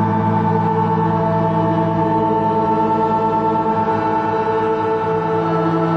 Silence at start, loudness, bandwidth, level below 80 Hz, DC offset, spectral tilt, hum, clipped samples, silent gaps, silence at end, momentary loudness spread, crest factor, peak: 0 s; -17 LUFS; 6.4 kHz; -48 dBFS; under 0.1%; -9 dB/octave; none; under 0.1%; none; 0 s; 2 LU; 12 dB; -4 dBFS